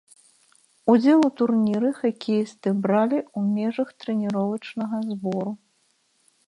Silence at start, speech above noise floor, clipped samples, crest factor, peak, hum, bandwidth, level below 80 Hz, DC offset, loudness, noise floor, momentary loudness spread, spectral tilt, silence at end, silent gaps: 0.85 s; 45 dB; under 0.1%; 18 dB; -6 dBFS; none; 11 kHz; -70 dBFS; under 0.1%; -23 LUFS; -67 dBFS; 10 LU; -7.5 dB/octave; 0.9 s; none